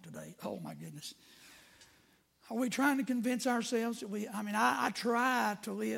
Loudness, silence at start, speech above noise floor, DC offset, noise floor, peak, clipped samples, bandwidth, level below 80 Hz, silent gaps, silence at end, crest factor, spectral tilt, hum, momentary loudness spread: -34 LUFS; 0.05 s; 34 dB; under 0.1%; -68 dBFS; -16 dBFS; under 0.1%; 16.5 kHz; -80 dBFS; none; 0 s; 20 dB; -4 dB/octave; none; 15 LU